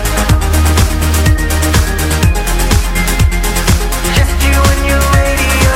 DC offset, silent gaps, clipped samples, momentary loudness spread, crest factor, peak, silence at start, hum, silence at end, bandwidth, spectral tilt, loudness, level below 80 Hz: under 0.1%; none; under 0.1%; 3 LU; 10 dB; 0 dBFS; 0 s; none; 0 s; 16.5 kHz; -4.5 dB/octave; -12 LUFS; -12 dBFS